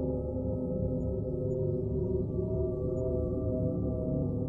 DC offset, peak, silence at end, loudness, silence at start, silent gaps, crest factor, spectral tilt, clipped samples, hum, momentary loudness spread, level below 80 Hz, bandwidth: under 0.1%; -18 dBFS; 0 s; -33 LUFS; 0 s; none; 12 dB; -14 dB/octave; under 0.1%; none; 2 LU; -42 dBFS; 1.4 kHz